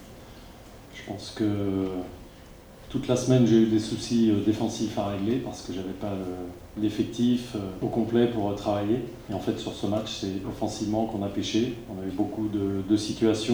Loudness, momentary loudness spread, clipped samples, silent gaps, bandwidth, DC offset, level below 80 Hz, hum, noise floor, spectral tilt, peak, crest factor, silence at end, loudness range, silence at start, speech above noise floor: -27 LUFS; 15 LU; under 0.1%; none; over 20 kHz; under 0.1%; -50 dBFS; none; -48 dBFS; -6 dB/octave; -8 dBFS; 18 dB; 0 s; 5 LU; 0 s; 21 dB